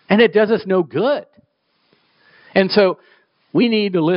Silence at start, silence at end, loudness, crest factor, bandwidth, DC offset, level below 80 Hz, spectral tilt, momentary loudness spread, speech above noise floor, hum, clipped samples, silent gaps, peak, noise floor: 0.1 s; 0 s; -17 LUFS; 16 dB; 5.6 kHz; under 0.1%; -64 dBFS; -4 dB/octave; 8 LU; 48 dB; none; under 0.1%; none; 0 dBFS; -64 dBFS